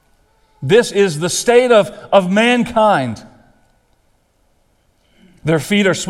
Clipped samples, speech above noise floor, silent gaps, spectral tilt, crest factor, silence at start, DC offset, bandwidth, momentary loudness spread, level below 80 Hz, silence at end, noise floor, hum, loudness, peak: under 0.1%; 45 dB; none; -4.5 dB/octave; 16 dB; 0.6 s; under 0.1%; 15 kHz; 11 LU; -50 dBFS; 0 s; -58 dBFS; none; -14 LUFS; 0 dBFS